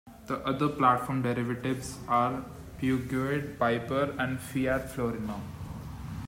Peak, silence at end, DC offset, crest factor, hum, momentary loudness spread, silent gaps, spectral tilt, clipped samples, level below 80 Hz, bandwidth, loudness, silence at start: -8 dBFS; 0 s; under 0.1%; 22 dB; none; 14 LU; none; -6.5 dB/octave; under 0.1%; -52 dBFS; 16 kHz; -30 LUFS; 0.05 s